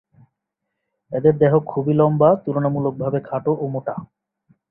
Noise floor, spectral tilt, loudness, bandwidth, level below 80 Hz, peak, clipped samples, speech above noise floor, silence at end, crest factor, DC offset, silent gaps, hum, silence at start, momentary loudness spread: -79 dBFS; -13 dB/octave; -19 LUFS; 3.4 kHz; -58 dBFS; -2 dBFS; under 0.1%; 61 dB; 0.65 s; 18 dB; under 0.1%; none; none; 1.1 s; 12 LU